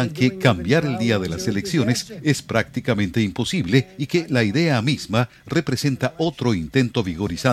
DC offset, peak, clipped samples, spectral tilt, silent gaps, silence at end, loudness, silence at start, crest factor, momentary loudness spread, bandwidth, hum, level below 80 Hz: under 0.1%; -2 dBFS; under 0.1%; -5.5 dB/octave; none; 0 s; -21 LUFS; 0 s; 20 dB; 5 LU; 14.5 kHz; none; -48 dBFS